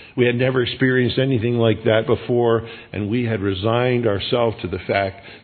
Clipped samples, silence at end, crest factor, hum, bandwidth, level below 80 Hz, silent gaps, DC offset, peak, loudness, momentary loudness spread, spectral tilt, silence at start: under 0.1%; 0.05 s; 18 dB; none; 4.5 kHz; -54 dBFS; none; under 0.1%; -2 dBFS; -20 LUFS; 5 LU; -10.5 dB/octave; 0 s